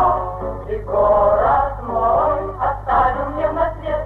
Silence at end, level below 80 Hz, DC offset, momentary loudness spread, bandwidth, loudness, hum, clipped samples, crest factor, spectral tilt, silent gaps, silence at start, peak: 0 s; -32 dBFS; under 0.1%; 9 LU; 4.4 kHz; -18 LUFS; none; under 0.1%; 12 dB; -8.5 dB/octave; none; 0 s; -6 dBFS